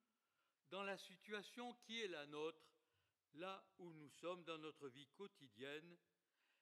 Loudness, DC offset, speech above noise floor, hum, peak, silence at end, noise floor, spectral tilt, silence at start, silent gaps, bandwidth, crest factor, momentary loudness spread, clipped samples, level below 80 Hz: -54 LUFS; under 0.1%; over 35 dB; none; -36 dBFS; 0.65 s; under -90 dBFS; -4 dB/octave; 0.7 s; none; 13 kHz; 20 dB; 11 LU; under 0.1%; under -90 dBFS